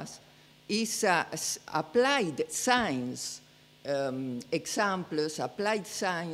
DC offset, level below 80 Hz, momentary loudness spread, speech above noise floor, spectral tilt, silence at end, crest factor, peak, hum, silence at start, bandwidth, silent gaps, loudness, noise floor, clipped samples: under 0.1%; -70 dBFS; 10 LU; 27 dB; -3 dB/octave; 0 s; 22 dB; -10 dBFS; none; 0 s; 16 kHz; none; -30 LUFS; -58 dBFS; under 0.1%